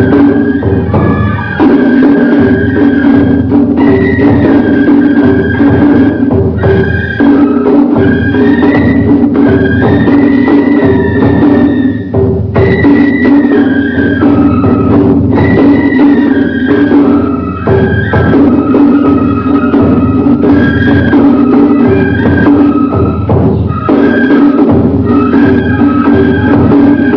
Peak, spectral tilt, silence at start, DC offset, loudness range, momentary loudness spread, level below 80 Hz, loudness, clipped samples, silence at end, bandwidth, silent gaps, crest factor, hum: 0 dBFS; -10.5 dB/octave; 0 s; under 0.1%; 1 LU; 3 LU; -28 dBFS; -7 LUFS; 4%; 0 s; 5.4 kHz; none; 6 dB; none